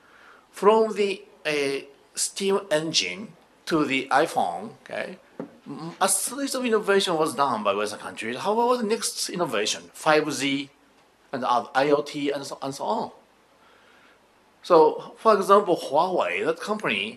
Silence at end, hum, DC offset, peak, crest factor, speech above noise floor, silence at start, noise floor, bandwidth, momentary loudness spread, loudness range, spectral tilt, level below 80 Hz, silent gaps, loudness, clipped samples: 0 s; none; under 0.1%; -2 dBFS; 22 dB; 35 dB; 0.55 s; -59 dBFS; 13 kHz; 16 LU; 4 LU; -3 dB/octave; -74 dBFS; none; -24 LUFS; under 0.1%